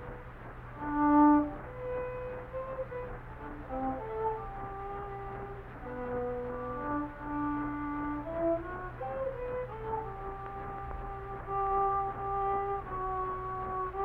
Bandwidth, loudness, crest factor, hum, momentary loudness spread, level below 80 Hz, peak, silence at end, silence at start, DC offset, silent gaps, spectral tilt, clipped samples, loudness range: 3.9 kHz; -34 LUFS; 20 dB; none; 12 LU; -48 dBFS; -14 dBFS; 0 s; 0 s; under 0.1%; none; -10 dB/octave; under 0.1%; 8 LU